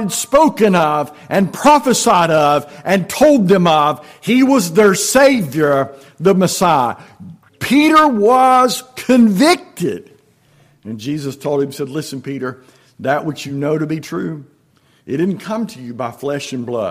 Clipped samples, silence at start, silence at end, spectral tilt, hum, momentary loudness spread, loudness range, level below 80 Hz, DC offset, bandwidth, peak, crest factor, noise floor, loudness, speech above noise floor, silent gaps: under 0.1%; 0 s; 0 s; -5 dB/octave; none; 14 LU; 10 LU; -52 dBFS; under 0.1%; 16 kHz; -2 dBFS; 14 dB; -55 dBFS; -14 LUFS; 41 dB; none